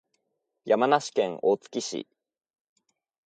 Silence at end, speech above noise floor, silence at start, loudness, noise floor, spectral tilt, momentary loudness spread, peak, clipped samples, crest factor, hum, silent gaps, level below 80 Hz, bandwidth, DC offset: 1.25 s; 54 dB; 0.65 s; -26 LUFS; -79 dBFS; -4 dB/octave; 13 LU; -8 dBFS; under 0.1%; 22 dB; none; none; -80 dBFS; 9.2 kHz; under 0.1%